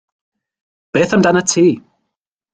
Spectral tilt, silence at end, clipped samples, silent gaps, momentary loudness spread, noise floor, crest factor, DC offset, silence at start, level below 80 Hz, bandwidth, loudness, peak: -4.5 dB/octave; 0.75 s; under 0.1%; none; 8 LU; -77 dBFS; 16 dB; under 0.1%; 0.95 s; -56 dBFS; 9.6 kHz; -14 LUFS; -2 dBFS